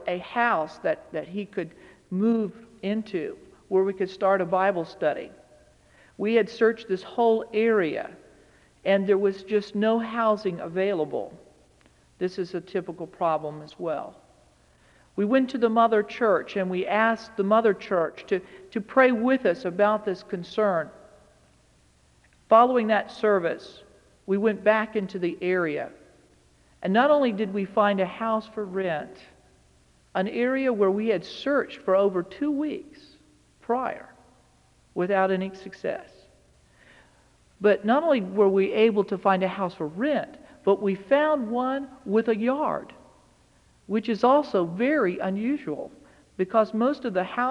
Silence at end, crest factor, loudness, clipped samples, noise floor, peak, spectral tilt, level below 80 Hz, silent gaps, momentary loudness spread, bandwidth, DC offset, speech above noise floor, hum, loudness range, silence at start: 0 s; 20 dB; -25 LUFS; under 0.1%; -60 dBFS; -6 dBFS; -7 dB/octave; -66 dBFS; none; 13 LU; 10.5 kHz; under 0.1%; 36 dB; none; 6 LU; 0 s